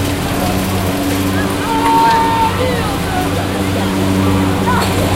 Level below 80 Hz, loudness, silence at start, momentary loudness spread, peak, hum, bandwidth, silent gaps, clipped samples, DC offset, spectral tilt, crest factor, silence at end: -30 dBFS; -14 LUFS; 0 s; 5 LU; 0 dBFS; none; 16.5 kHz; none; under 0.1%; under 0.1%; -5 dB/octave; 14 dB; 0 s